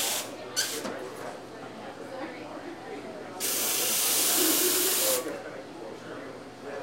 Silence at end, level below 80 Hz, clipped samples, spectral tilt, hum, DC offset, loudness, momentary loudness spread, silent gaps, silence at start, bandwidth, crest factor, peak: 0 s; -70 dBFS; under 0.1%; -0.5 dB/octave; none; under 0.1%; -25 LUFS; 19 LU; none; 0 s; 16 kHz; 18 dB; -12 dBFS